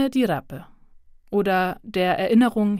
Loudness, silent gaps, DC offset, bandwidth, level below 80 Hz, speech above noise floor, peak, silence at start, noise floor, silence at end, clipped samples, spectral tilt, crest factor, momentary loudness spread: -22 LUFS; none; under 0.1%; 15.5 kHz; -54 dBFS; 28 dB; -8 dBFS; 0 s; -49 dBFS; 0 s; under 0.1%; -6.5 dB/octave; 14 dB; 12 LU